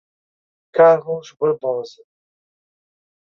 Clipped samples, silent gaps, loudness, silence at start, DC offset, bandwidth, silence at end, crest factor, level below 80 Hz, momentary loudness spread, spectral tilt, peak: under 0.1%; none; -18 LUFS; 0.75 s; under 0.1%; 6.8 kHz; 1.45 s; 18 dB; -74 dBFS; 15 LU; -6.5 dB/octave; -2 dBFS